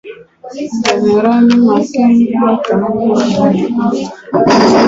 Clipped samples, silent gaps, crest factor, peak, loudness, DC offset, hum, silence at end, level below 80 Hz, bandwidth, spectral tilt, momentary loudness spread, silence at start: under 0.1%; none; 10 dB; 0 dBFS; -11 LUFS; under 0.1%; none; 0 s; -48 dBFS; 7.8 kHz; -6 dB/octave; 9 LU; 0.05 s